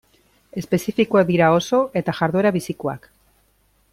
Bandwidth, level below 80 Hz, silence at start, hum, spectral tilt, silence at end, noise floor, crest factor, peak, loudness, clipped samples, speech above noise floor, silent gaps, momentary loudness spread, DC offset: 15.5 kHz; -56 dBFS; 0.55 s; none; -6.5 dB/octave; 0.95 s; -61 dBFS; 18 dB; -4 dBFS; -19 LUFS; under 0.1%; 42 dB; none; 14 LU; under 0.1%